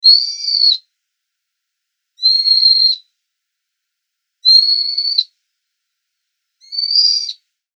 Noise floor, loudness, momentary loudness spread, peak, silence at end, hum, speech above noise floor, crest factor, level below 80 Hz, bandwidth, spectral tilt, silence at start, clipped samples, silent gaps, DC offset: -77 dBFS; -11 LUFS; 12 LU; 0 dBFS; 0.45 s; none; 61 dB; 16 dB; under -90 dBFS; 8.8 kHz; 13.5 dB/octave; 0.05 s; under 0.1%; none; under 0.1%